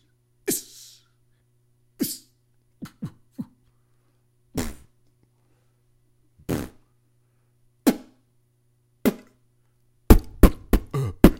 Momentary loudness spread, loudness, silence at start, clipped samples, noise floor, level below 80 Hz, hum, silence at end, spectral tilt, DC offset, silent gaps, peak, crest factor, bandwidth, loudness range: 23 LU; -25 LUFS; 0.45 s; under 0.1%; -65 dBFS; -30 dBFS; none; 0.05 s; -6 dB/octave; under 0.1%; none; 0 dBFS; 26 dB; 16.5 kHz; 15 LU